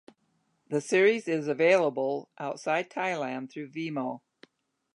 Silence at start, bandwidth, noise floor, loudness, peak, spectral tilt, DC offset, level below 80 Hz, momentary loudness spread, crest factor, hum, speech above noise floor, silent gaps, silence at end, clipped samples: 0.7 s; 11 kHz; -73 dBFS; -28 LUFS; -10 dBFS; -5 dB/octave; under 0.1%; -86 dBFS; 14 LU; 20 dB; none; 45 dB; none; 0.75 s; under 0.1%